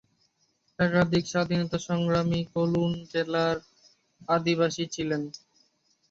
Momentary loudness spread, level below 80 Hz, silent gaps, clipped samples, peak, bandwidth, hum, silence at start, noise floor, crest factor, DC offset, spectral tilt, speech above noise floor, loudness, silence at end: 8 LU; -58 dBFS; none; under 0.1%; -8 dBFS; 7.8 kHz; none; 0.8 s; -71 dBFS; 20 dB; under 0.1%; -6 dB/octave; 45 dB; -27 LUFS; 0.75 s